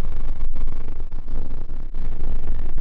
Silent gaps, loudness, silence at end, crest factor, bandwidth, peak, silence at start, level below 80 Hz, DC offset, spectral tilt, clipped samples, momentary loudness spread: none; -32 LUFS; 0 s; 6 dB; 1.4 kHz; -8 dBFS; 0 s; -20 dBFS; under 0.1%; -8.5 dB/octave; under 0.1%; 5 LU